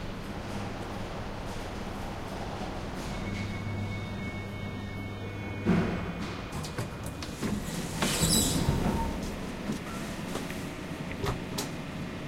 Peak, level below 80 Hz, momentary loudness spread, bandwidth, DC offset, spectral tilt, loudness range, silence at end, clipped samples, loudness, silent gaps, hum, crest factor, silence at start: -12 dBFS; -42 dBFS; 10 LU; 16 kHz; under 0.1%; -4.5 dB/octave; 7 LU; 0 s; under 0.1%; -33 LUFS; none; none; 22 dB; 0 s